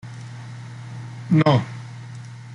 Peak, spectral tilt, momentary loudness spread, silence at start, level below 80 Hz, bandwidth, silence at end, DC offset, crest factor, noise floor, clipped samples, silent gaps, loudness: -4 dBFS; -7.5 dB/octave; 20 LU; 0.05 s; -60 dBFS; 10.5 kHz; 0 s; under 0.1%; 20 dB; -37 dBFS; under 0.1%; none; -20 LUFS